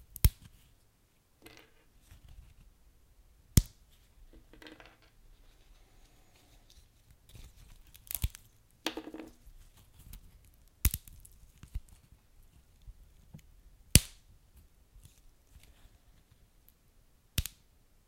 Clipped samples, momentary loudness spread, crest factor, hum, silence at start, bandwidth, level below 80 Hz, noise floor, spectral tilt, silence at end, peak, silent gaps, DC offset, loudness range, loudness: under 0.1%; 28 LU; 40 dB; none; 0.25 s; 16.5 kHz; -44 dBFS; -69 dBFS; -3.5 dB/octave; 0.65 s; 0 dBFS; none; under 0.1%; 12 LU; -33 LUFS